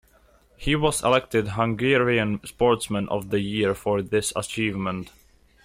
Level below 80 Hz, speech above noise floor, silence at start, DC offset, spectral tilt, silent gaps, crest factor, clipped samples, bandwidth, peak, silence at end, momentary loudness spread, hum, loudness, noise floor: -46 dBFS; 34 dB; 0.6 s; under 0.1%; -4.5 dB/octave; none; 16 dB; under 0.1%; 16 kHz; -8 dBFS; 0.55 s; 8 LU; none; -24 LUFS; -58 dBFS